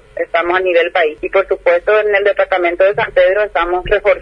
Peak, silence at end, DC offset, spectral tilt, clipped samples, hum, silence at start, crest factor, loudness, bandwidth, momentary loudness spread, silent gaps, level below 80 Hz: 0 dBFS; 0 s; under 0.1%; -6 dB/octave; under 0.1%; none; 0.15 s; 14 dB; -13 LUFS; 5.6 kHz; 4 LU; none; -38 dBFS